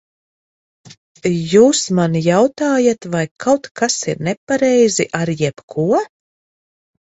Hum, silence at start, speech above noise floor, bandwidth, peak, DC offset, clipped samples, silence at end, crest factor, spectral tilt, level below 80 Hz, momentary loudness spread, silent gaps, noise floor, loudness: none; 1.25 s; over 75 dB; 8.4 kHz; 0 dBFS; under 0.1%; under 0.1%; 0.95 s; 16 dB; -5 dB/octave; -56 dBFS; 9 LU; 3.31-3.36 s, 3.71-3.75 s, 4.37-4.47 s, 5.63-5.68 s; under -90 dBFS; -16 LUFS